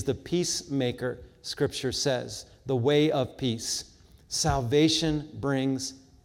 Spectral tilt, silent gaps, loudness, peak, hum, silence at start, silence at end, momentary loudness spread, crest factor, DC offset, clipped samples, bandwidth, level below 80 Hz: -4.5 dB/octave; none; -28 LUFS; -12 dBFS; none; 0 s; 0.25 s; 12 LU; 16 dB; under 0.1%; under 0.1%; 16.5 kHz; -50 dBFS